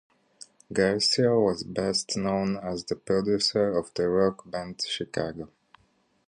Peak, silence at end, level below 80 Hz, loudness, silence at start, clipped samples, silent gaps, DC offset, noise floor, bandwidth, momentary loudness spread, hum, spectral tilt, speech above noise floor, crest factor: -8 dBFS; 0.8 s; -58 dBFS; -26 LUFS; 0.7 s; under 0.1%; none; under 0.1%; -67 dBFS; 11 kHz; 11 LU; none; -4.5 dB/octave; 41 dB; 20 dB